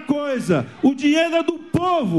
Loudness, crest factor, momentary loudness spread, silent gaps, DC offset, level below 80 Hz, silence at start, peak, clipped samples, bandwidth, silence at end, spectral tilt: -20 LUFS; 14 dB; 5 LU; none; 0.2%; -54 dBFS; 0 s; -6 dBFS; under 0.1%; 12.5 kHz; 0 s; -6 dB/octave